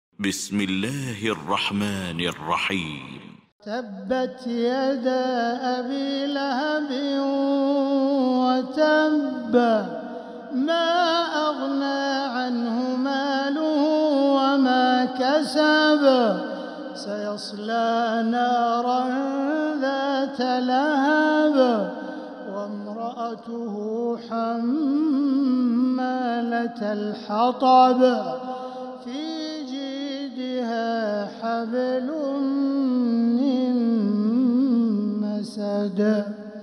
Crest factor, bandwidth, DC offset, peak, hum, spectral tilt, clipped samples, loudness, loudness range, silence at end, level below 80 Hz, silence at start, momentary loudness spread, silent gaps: 16 dB; 13.5 kHz; under 0.1%; -6 dBFS; none; -5 dB/octave; under 0.1%; -23 LUFS; 6 LU; 0 s; -70 dBFS; 0.2 s; 12 LU; 3.52-3.59 s